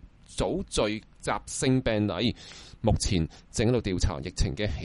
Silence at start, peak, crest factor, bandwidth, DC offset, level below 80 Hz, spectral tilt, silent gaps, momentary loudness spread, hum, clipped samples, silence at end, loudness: 0.05 s; -10 dBFS; 18 dB; 11.5 kHz; under 0.1%; -36 dBFS; -5 dB/octave; none; 7 LU; none; under 0.1%; 0 s; -28 LUFS